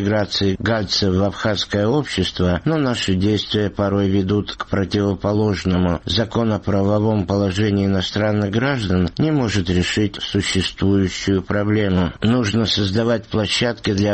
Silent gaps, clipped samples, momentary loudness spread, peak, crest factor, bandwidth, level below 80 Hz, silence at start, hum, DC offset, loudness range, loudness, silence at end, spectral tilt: none; under 0.1%; 2 LU; -6 dBFS; 12 dB; 8.8 kHz; -40 dBFS; 0 s; none; under 0.1%; 1 LU; -19 LUFS; 0 s; -6 dB/octave